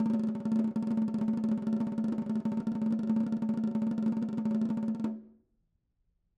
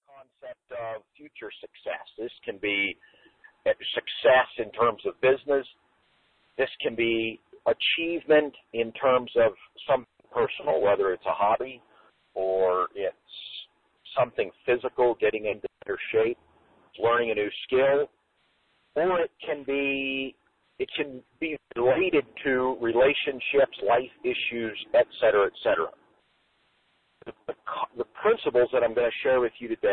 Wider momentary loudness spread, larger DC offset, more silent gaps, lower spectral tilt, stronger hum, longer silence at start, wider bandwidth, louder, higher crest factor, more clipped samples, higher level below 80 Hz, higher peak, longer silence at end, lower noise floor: second, 3 LU vs 16 LU; neither; neither; first, -9.5 dB/octave vs -8 dB/octave; neither; second, 0 s vs 0.15 s; first, 5.4 kHz vs 4.5 kHz; second, -32 LUFS vs -26 LUFS; second, 12 dB vs 18 dB; neither; second, -70 dBFS vs -62 dBFS; second, -18 dBFS vs -8 dBFS; first, 1.1 s vs 0 s; first, -76 dBFS vs -70 dBFS